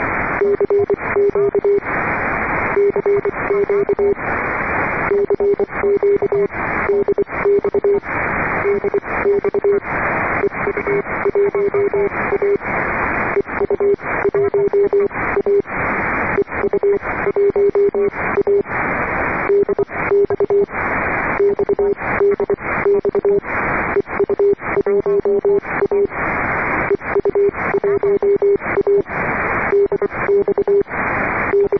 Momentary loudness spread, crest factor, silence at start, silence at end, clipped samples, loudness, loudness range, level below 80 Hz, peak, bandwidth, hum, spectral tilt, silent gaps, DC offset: 3 LU; 10 dB; 0 s; 0 s; under 0.1%; -17 LUFS; 1 LU; -40 dBFS; -6 dBFS; 2.7 kHz; none; -9.5 dB/octave; none; 0.4%